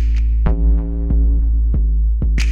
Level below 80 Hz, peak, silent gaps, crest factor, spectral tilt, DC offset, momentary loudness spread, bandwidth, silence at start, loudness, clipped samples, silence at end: -14 dBFS; -4 dBFS; none; 10 dB; -7 dB/octave; under 0.1%; 2 LU; 7 kHz; 0 s; -18 LUFS; under 0.1%; 0 s